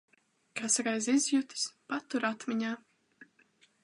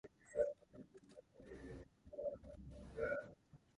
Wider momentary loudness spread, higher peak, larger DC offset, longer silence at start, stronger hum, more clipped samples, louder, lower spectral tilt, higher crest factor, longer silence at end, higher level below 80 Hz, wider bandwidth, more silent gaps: second, 11 LU vs 20 LU; first, -16 dBFS vs -26 dBFS; neither; first, 0.55 s vs 0.05 s; neither; neither; first, -32 LUFS vs -47 LUFS; second, -2 dB/octave vs -6.5 dB/octave; about the same, 18 dB vs 22 dB; first, 0.6 s vs 0.2 s; second, -88 dBFS vs -66 dBFS; about the same, 11.5 kHz vs 11 kHz; neither